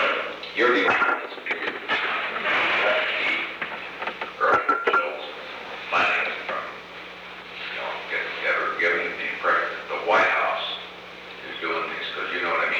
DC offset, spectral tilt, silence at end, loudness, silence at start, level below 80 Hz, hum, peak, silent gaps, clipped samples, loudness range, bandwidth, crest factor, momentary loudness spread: under 0.1%; -3.5 dB/octave; 0 s; -24 LUFS; 0 s; -66 dBFS; none; -8 dBFS; none; under 0.1%; 4 LU; 19 kHz; 18 dB; 15 LU